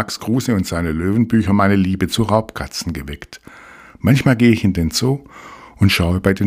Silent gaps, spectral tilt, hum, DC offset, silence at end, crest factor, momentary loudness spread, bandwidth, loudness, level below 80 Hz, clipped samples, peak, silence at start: none; -6 dB/octave; none; under 0.1%; 0 s; 16 dB; 13 LU; 16 kHz; -17 LUFS; -36 dBFS; under 0.1%; 0 dBFS; 0 s